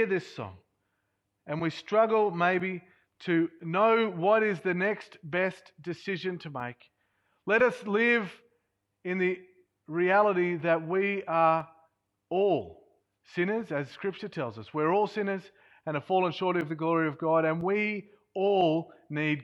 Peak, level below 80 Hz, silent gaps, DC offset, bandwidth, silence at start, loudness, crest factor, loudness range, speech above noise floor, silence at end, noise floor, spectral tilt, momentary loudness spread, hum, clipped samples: -12 dBFS; -74 dBFS; none; under 0.1%; 10.5 kHz; 0 s; -28 LUFS; 18 dB; 4 LU; 51 dB; 0 s; -79 dBFS; -7 dB/octave; 14 LU; none; under 0.1%